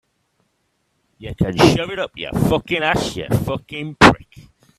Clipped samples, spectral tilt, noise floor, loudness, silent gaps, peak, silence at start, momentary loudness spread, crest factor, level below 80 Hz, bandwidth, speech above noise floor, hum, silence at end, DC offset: under 0.1%; -5.5 dB/octave; -68 dBFS; -17 LUFS; none; 0 dBFS; 1.2 s; 15 LU; 20 dB; -40 dBFS; 14.5 kHz; 50 dB; none; 0.55 s; under 0.1%